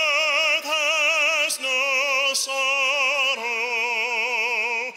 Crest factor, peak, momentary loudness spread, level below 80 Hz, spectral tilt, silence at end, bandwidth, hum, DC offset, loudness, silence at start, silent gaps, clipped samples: 14 dB; -8 dBFS; 4 LU; -82 dBFS; 2.5 dB/octave; 0 s; 16 kHz; none; under 0.1%; -20 LUFS; 0 s; none; under 0.1%